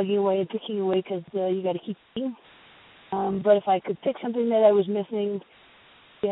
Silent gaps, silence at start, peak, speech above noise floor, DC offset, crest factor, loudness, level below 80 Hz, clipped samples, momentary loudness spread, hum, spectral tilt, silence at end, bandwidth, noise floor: none; 0 s; -8 dBFS; 30 dB; under 0.1%; 18 dB; -25 LUFS; -70 dBFS; under 0.1%; 13 LU; none; -11 dB/octave; 0 s; 4.1 kHz; -54 dBFS